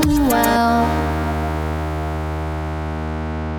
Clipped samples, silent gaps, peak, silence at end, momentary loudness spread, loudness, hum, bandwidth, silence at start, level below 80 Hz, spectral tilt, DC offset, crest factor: under 0.1%; none; -4 dBFS; 0 s; 10 LU; -20 LUFS; none; 19 kHz; 0 s; -28 dBFS; -6 dB/octave; under 0.1%; 16 dB